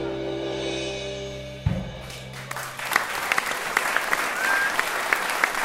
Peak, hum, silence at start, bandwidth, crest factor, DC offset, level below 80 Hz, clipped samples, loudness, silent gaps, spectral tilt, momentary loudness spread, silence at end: -4 dBFS; none; 0 s; 16 kHz; 24 dB; under 0.1%; -46 dBFS; under 0.1%; -25 LUFS; none; -3 dB/octave; 12 LU; 0 s